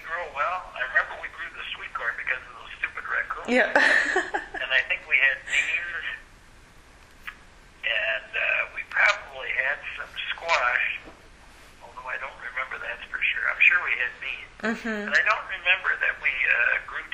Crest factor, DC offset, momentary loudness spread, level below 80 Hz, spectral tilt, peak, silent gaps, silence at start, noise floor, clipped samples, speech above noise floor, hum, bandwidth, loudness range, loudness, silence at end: 22 dB; under 0.1%; 14 LU; -54 dBFS; -2 dB/octave; -4 dBFS; none; 0 s; -51 dBFS; under 0.1%; 25 dB; none; 15 kHz; 6 LU; -24 LUFS; 0 s